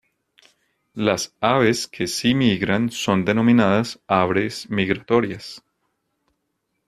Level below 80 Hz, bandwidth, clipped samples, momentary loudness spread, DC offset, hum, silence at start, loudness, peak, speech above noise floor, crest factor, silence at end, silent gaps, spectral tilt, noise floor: -56 dBFS; 14 kHz; under 0.1%; 8 LU; under 0.1%; none; 0.95 s; -20 LUFS; -2 dBFS; 55 dB; 20 dB; 1.3 s; none; -5 dB/octave; -75 dBFS